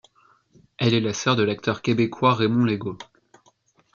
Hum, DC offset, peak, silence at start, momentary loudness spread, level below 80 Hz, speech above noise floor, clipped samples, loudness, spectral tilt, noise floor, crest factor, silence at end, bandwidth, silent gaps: none; under 0.1%; -4 dBFS; 0.8 s; 7 LU; -62 dBFS; 40 dB; under 0.1%; -22 LUFS; -5.5 dB/octave; -62 dBFS; 20 dB; 0.9 s; 7.4 kHz; none